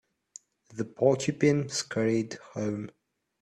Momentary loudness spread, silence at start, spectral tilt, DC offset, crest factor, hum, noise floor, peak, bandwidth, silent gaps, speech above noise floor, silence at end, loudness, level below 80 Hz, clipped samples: 13 LU; 0.7 s; -5.5 dB/octave; under 0.1%; 20 dB; none; -54 dBFS; -8 dBFS; 12.5 kHz; none; 26 dB; 0.5 s; -29 LUFS; -66 dBFS; under 0.1%